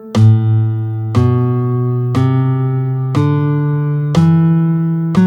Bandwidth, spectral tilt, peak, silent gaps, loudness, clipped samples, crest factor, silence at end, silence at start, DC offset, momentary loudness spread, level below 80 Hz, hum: 8.2 kHz; -9 dB/octave; 0 dBFS; none; -14 LUFS; under 0.1%; 12 dB; 0 s; 0 s; under 0.1%; 6 LU; -48 dBFS; none